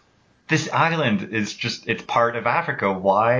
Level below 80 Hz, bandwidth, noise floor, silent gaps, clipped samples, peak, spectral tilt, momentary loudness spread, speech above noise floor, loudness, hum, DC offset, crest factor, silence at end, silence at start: -58 dBFS; 7.6 kHz; -50 dBFS; none; under 0.1%; -6 dBFS; -5 dB/octave; 7 LU; 29 dB; -22 LUFS; none; under 0.1%; 16 dB; 0 s; 0.5 s